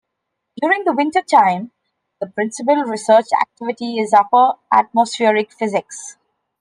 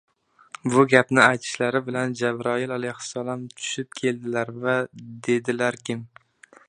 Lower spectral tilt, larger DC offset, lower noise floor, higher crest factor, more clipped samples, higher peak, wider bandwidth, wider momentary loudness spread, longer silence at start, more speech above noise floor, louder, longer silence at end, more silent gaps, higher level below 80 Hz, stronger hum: about the same, -4 dB/octave vs -4.5 dB/octave; neither; first, -77 dBFS vs -46 dBFS; second, 16 dB vs 24 dB; neither; about the same, 0 dBFS vs 0 dBFS; about the same, 10.5 kHz vs 10.5 kHz; about the same, 13 LU vs 14 LU; about the same, 0.55 s vs 0.65 s; first, 60 dB vs 23 dB; first, -16 LUFS vs -23 LUFS; about the same, 0.5 s vs 0.6 s; neither; about the same, -70 dBFS vs -68 dBFS; neither